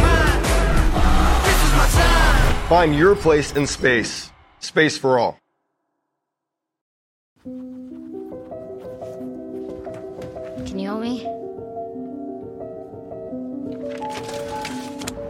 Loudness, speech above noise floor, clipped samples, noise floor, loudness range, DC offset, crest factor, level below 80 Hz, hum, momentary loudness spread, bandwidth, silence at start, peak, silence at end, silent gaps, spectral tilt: -19 LUFS; 64 dB; under 0.1%; -82 dBFS; 19 LU; under 0.1%; 18 dB; -24 dBFS; none; 19 LU; 16 kHz; 0 s; -2 dBFS; 0 s; 6.81-7.36 s; -4.5 dB/octave